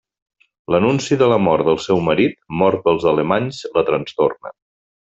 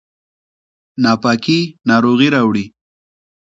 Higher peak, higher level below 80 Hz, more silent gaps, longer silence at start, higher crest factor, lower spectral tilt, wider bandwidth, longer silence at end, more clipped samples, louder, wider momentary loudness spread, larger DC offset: about the same, -2 dBFS vs 0 dBFS; about the same, -52 dBFS vs -56 dBFS; neither; second, 0.7 s vs 1 s; about the same, 16 dB vs 16 dB; about the same, -6 dB/octave vs -6 dB/octave; about the same, 8 kHz vs 7.8 kHz; second, 0.6 s vs 0.75 s; neither; second, -17 LUFS vs -14 LUFS; second, 5 LU vs 10 LU; neither